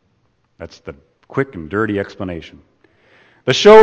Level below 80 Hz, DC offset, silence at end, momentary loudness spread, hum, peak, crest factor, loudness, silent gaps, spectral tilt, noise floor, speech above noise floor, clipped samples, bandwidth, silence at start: -48 dBFS; under 0.1%; 0 s; 23 LU; none; 0 dBFS; 16 dB; -17 LUFS; none; -5 dB/octave; -62 dBFS; 49 dB; 0.3%; 8.2 kHz; 0.6 s